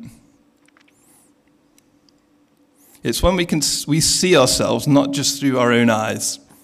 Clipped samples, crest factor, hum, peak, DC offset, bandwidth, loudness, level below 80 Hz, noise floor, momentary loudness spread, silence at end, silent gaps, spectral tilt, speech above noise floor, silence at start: under 0.1%; 16 dB; none; -4 dBFS; under 0.1%; 16 kHz; -17 LUFS; -38 dBFS; -58 dBFS; 9 LU; 0.3 s; none; -3.5 dB/octave; 41 dB; 0 s